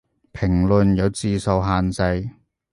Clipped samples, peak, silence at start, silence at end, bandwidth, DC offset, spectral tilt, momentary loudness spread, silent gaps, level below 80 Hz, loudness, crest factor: under 0.1%; -4 dBFS; 0.35 s; 0.4 s; 11.5 kHz; under 0.1%; -7 dB/octave; 9 LU; none; -34 dBFS; -20 LUFS; 16 dB